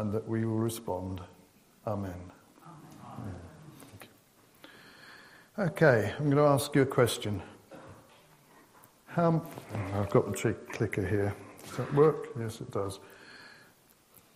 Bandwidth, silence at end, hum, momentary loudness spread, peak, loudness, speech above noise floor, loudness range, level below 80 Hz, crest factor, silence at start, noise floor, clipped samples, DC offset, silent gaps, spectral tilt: 15.5 kHz; 0.85 s; none; 26 LU; -8 dBFS; -30 LUFS; 33 dB; 15 LU; -66 dBFS; 24 dB; 0 s; -62 dBFS; under 0.1%; under 0.1%; none; -6.5 dB/octave